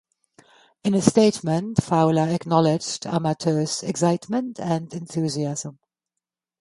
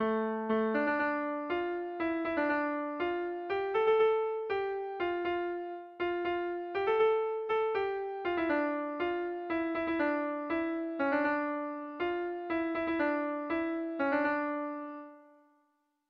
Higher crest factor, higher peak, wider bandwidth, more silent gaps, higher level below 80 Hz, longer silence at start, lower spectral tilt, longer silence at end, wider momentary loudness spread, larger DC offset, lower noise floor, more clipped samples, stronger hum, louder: first, 22 dB vs 14 dB; first, 0 dBFS vs -18 dBFS; first, 11.5 kHz vs 5.8 kHz; neither; first, -56 dBFS vs -68 dBFS; first, 0.85 s vs 0 s; about the same, -6 dB/octave vs -7 dB/octave; about the same, 0.9 s vs 0.85 s; about the same, 8 LU vs 7 LU; neither; first, -86 dBFS vs -76 dBFS; neither; neither; first, -22 LUFS vs -33 LUFS